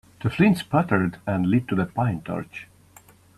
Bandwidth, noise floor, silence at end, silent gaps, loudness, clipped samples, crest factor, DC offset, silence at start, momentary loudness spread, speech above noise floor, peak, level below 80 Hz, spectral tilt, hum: 13 kHz; -53 dBFS; 0.75 s; none; -23 LUFS; under 0.1%; 18 dB; under 0.1%; 0.2 s; 12 LU; 30 dB; -6 dBFS; -54 dBFS; -7.5 dB/octave; none